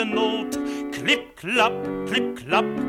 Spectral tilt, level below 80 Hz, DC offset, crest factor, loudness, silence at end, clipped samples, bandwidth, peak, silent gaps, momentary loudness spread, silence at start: -4 dB/octave; -56 dBFS; under 0.1%; 18 dB; -23 LUFS; 0 s; under 0.1%; 16.5 kHz; -6 dBFS; none; 7 LU; 0 s